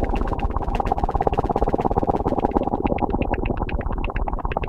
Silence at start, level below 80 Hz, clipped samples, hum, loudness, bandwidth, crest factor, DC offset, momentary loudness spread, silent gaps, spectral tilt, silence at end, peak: 0 s; -26 dBFS; under 0.1%; none; -24 LUFS; 6.8 kHz; 22 dB; under 0.1%; 5 LU; none; -9 dB/octave; 0 s; 0 dBFS